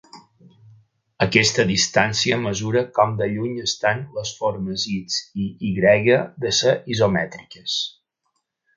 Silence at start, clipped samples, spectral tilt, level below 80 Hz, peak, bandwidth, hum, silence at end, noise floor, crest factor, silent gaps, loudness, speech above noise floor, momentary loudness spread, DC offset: 0.15 s; under 0.1%; -4 dB/octave; -52 dBFS; 0 dBFS; 9.6 kHz; none; 0.85 s; -74 dBFS; 22 dB; none; -20 LUFS; 53 dB; 9 LU; under 0.1%